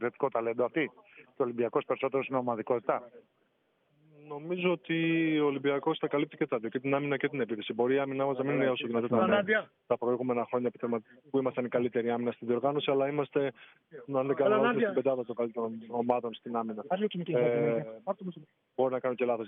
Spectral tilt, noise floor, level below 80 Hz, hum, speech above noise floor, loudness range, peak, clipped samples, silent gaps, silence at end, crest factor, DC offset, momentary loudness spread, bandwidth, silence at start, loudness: -4.5 dB/octave; -73 dBFS; -86 dBFS; none; 42 dB; 3 LU; -12 dBFS; under 0.1%; none; 0 s; 18 dB; under 0.1%; 8 LU; 3.9 kHz; 0 s; -31 LUFS